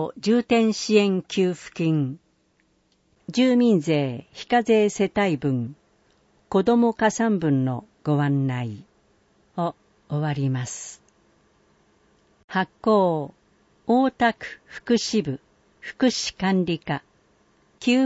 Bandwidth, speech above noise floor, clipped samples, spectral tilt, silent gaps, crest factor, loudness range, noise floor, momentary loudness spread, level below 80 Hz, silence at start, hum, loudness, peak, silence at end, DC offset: 8 kHz; 43 dB; under 0.1%; -6 dB/octave; 12.44-12.48 s; 18 dB; 7 LU; -66 dBFS; 16 LU; -60 dBFS; 0 s; none; -23 LUFS; -6 dBFS; 0 s; under 0.1%